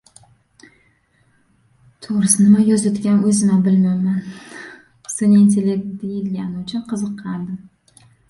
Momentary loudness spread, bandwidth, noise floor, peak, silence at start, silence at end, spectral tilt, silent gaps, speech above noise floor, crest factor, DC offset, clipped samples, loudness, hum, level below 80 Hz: 22 LU; 11.5 kHz; -59 dBFS; -2 dBFS; 2 s; 0.7 s; -6 dB/octave; none; 43 dB; 16 dB; under 0.1%; under 0.1%; -17 LUFS; none; -58 dBFS